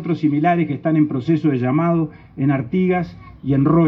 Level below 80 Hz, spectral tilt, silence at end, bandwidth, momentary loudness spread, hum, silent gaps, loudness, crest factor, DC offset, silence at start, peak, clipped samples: -48 dBFS; -10.5 dB/octave; 0 s; 5.8 kHz; 5 LU; none; none; -19 LUFS; 14 dB; under 0.1%; 0 s; -4 dBFS; under 0.1%